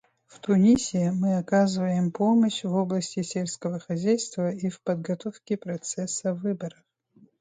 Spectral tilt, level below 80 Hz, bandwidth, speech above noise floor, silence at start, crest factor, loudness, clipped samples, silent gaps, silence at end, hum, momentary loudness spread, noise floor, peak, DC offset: -6 dB/octave; -64 dBFS; 9.6 kHz; 34 dB; 0.45 s; 16 dB; -26 LUFS; under 0.1%; none; 0.7 s; none; 11 LU; -59 dBFS; -10 dBFS; under 0.1%